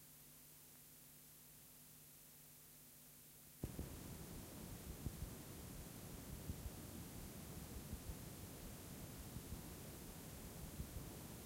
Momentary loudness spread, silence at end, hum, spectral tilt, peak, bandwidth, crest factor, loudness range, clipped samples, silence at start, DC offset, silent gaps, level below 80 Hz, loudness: 8 LU; 0 s; none; -4.5 dB/octave; -34 dBFS; 16 kHz; 20 dB; 5 LU; under 0.1%; 0 s; under 0.1%; none; -60 dBFS; -54 LUFS